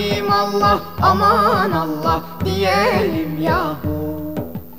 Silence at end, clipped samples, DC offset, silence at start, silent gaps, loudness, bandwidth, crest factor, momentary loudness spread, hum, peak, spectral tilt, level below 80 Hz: 0 s; under 0.1%; 1%; 0 s; none; -17 LUFS; 16 kHz; 16 dB; 10 LU; none; -2 dBFS; -6 dB/octave; -38 dBFS